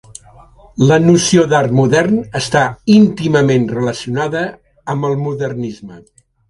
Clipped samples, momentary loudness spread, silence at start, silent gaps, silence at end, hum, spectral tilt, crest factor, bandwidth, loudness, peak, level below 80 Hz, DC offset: under 0.1%; 14 LU; 0.75 s; none; 0.5 s; none; -5.5 dB/octave; 14 dB; 11.5 kHz; -14 LUFS; 0 dBFS; -46 dBFS; under 0.1%